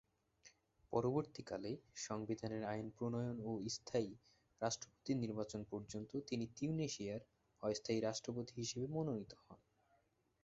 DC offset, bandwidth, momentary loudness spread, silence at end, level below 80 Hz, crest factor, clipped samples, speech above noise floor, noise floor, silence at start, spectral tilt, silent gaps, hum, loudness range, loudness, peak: under 0.1%; 7.6 kHz; 7 LU; 0.9 s; -72 dBFS; 20 dB; under 0.1%; 36 dB; -79 dBFS; 0.45 s; -6 dB/octave; none; none; 1 LU; -44 LUFS; -24 dBFS